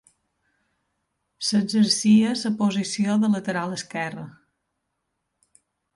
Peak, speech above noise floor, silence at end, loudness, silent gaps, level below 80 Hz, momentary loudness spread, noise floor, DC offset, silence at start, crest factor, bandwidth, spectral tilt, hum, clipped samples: -8 dBFS; 56 dB; 1.65 s; -22 LUFS; none; -70 dBFS; 12 LU; -78 dBFS; under 0.1%; 1.4 s; 16 dB; 11.5 kHz; -4.5 dB/octave; none; under 0.1%